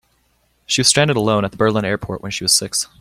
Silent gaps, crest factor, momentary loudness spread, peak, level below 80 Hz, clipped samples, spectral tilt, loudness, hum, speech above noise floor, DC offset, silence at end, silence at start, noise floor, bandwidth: none; 18 dB; 9 LU; 0 dBFS; -48 dBFS; under 0.1%; -3 dB/octave; -16 LUFS; none; 44 dB; under 0.1%; 0.15 s; 0.7 s; -62 dBFS; 16.5 kHz